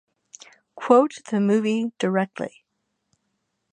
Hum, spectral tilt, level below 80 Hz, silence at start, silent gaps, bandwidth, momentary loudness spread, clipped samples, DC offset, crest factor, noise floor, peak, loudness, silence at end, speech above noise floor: none; -6.5 dB/octave; -76 dBFS; 0.75 s; none; 9.6 kHz; 16 LU; under 0.1%; under 0.1%; 22 dB; -76 dBFS; -2 dBFS; -22 LUFS; 1.25 s; 55 dB